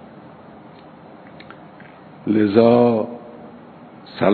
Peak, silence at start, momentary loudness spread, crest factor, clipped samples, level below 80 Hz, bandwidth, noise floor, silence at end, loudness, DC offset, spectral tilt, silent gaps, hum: 0 dBFS; 2.25 s; 27 LU; 20 dB; under 0.1%; -62 dBFS; 4.5 kHz; -42 dBFS; 0 s; -17 LUFS; under 0.1%; -11 dB/octave; none; none